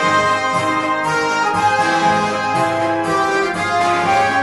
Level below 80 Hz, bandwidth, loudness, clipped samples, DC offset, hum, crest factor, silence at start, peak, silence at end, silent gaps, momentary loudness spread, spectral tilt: -52 dBFS; 11.5 kHz; -16 LUFS; under 0.1%; under 0.1%; none; 14 dB; 0 s; -2 dBFS; 0 s; none; 3 LU; -4 dB/octave